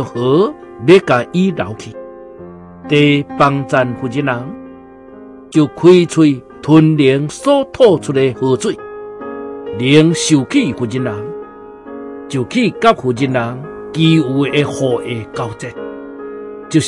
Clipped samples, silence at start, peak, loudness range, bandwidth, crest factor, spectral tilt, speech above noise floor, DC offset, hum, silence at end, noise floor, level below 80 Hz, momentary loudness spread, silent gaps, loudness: under 0.1%; 0 s; 0 dBFS; 5 LU; 11.5 kHz; 14 dB; -6 dB/octave; 23 dB; under 0.1%; none; 0 s; -36 dBFS; -50 dBFS; 19 LU; none; -13 LUFS